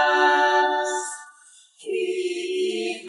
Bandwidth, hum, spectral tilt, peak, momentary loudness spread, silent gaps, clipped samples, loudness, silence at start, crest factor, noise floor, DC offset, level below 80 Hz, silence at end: 11.5 kHz; none; -1 dB/octave; -6 dBFS; 15 LU; none; under 0.1%; -22 LUFS; 0 s; 16 dB; -52 dBFS; under 0.1%; -88 dBFS; 0 s